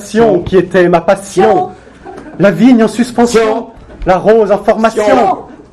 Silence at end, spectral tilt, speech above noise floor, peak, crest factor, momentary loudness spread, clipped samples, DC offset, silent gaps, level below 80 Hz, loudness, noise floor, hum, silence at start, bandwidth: 0.15 s; -6 dB/octave; 22 dB; 0 dBFS; 10 dB; 12 LU; 1%; under 0.1%; none; -36 dBFS; -10 LUFS; -31 dBFS; none; 0 s; 13 kHz